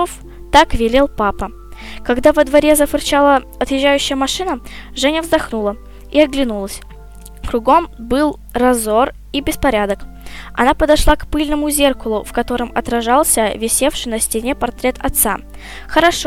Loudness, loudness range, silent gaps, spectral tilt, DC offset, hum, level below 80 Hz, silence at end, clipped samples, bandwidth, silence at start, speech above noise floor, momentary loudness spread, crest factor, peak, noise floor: -15 LUFS; 3 LU; none; -3 dB/octave; under 0.1%; none; -28 dBFS; 0 s; 0.2%; 17 kHz; 0 s; 20 dB; 14 LU; 16 dB; 0 dBFS; -35 dBFS